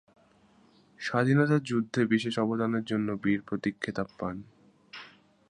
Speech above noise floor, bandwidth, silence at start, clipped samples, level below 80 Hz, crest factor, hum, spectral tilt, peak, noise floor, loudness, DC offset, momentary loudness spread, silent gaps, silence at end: 34 dB; 10.5 kHz; 1 s; under 0.1%; -64 dBFS; 20 dB; none; -7 dB/octave; -10 dBFS; -62 dBFS; -29 LUFS; under 0.1%; 19 LU; none; 0.4 s